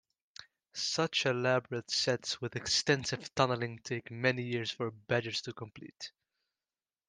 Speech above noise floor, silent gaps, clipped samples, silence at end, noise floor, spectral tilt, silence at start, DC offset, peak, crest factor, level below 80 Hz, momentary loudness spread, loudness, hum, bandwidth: over 56 dB; none; under 0.1%; 1 s; under -90 dBFS; -3.5 dB/octave; 0.4 s; under 0.1%; -12 dBFS; 24 dB; -70 dBFS; 17 LU; -33 LUFS; none; 10.5 kHz